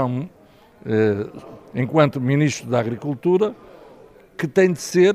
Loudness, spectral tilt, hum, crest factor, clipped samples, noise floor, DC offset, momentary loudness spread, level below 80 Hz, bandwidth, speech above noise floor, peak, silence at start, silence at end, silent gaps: -21 LUFS; -6.5 dB/octave; none; 20 dB; under 0.1%; -47 dBFS; under 0.1%; 15 LU; -60 dBFS; 14 kHz; 27 dB; 0 dBFS; 0 s; 0 s; none